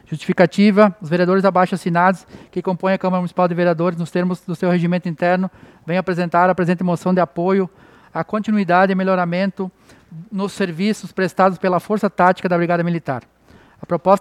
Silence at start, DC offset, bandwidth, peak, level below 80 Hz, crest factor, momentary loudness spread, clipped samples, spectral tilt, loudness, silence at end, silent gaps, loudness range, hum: 0.1 s; under 0.1%; 12 kHz; 0 dBFS; -60 dBFS; 18 dB; 11 LU; under 0.1%; -7.5 dB/octave; -18 LUFS; 0 s; none; 3 LU; none